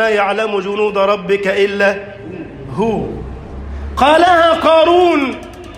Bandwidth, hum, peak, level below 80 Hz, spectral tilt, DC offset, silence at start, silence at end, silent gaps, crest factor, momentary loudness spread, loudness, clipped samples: 15 kHz; none; 0 dBFS; -34 dBFS; -5.5 dB/octave; under 0.1%; 0 s; 0 s; none; 14 dB; 20 LU; -13 LUFS; under 0.1%